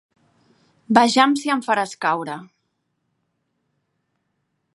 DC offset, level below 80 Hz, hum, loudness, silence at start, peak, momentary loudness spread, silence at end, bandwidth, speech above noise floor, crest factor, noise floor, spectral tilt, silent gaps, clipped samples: under 0.1%; -74 dBFS; none; -19 LUFS; 0.9 s; 0 dBFS; 12 LU; 2.3 s; 11.5 kHz; 54 dB; 24 dB; -73 dBFS; -3.5 dB/octave; none; under 0.1%